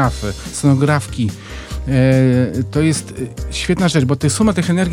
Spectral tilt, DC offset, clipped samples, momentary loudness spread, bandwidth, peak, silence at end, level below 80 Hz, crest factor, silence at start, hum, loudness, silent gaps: -6 dB/octave; under 0.1%; under 0.1%; 12 LU; 14 kHz; -2 dBFS; 0 s; -32 dBFS; 14 dB; 0 s; none; -16 LUFS; none